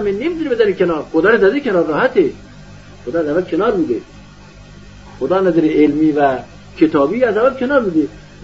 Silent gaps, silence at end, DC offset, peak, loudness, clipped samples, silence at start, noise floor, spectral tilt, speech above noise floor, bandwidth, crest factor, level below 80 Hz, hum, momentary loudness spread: none; 0 s; 0.3%; 0 dBFS; -15 LUFS; under 0.1%; 0 s; -39 dBFS; -5 dB/octave; 24 dB; 7.6 kHz; 14 dB; -44 dBFS; 50 Hz at -40 dBFS; 8 LU